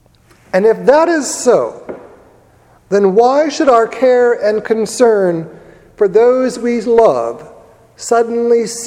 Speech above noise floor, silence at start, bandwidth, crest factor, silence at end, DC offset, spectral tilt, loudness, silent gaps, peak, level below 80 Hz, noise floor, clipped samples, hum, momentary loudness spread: 36 dB; 0.55 s; 14.5 kHz; 12 dB; 0 s; under 0.1%; -4.5 dB/octave; -12 LUFS; none; 0 dBFS; -54 dBFS; -47 dBFS; under 0.1%; none; 13 LU